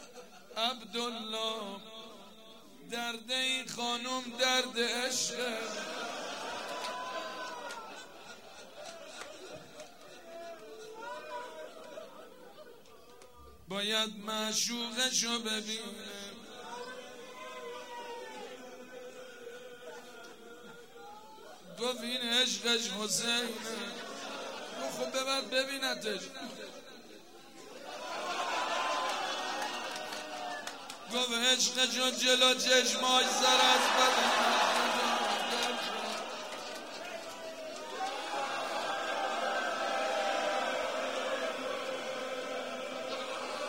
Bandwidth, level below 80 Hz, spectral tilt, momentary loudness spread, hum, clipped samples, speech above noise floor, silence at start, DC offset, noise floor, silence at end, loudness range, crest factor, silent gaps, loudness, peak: 16 kHz; -78 dBFS; -0.5 dB/octave; 22 LU; none; under 0.1%; 25 dB; 0 s; 0.1%; -56 dBFS; 0 s; 20 LU; 22 dB; none; -32 LUFS; -12 dBFS